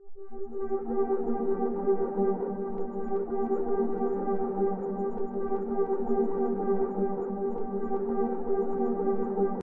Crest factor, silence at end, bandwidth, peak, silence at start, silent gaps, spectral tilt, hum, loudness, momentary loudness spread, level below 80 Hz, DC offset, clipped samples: 14 dB; 0 s; 2.5 kHz; -14 dBFS; 0 s; none; -12 dB/octave; none; -30 LUFS; 5 LU; -54 dBFS; under 0.1%; under 0.1%